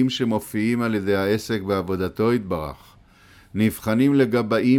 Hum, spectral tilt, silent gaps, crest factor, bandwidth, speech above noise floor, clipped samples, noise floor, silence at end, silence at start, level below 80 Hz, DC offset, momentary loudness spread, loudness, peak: none; -6.5 dB/octave; none; 14 dB; 17.5 kHz; 30 dB; under 0.1%; -51 dBFS; 0 s; 0 s; -50 dBFS; under 0.1%; 8 LU; -22 LUFS; -8 dBFS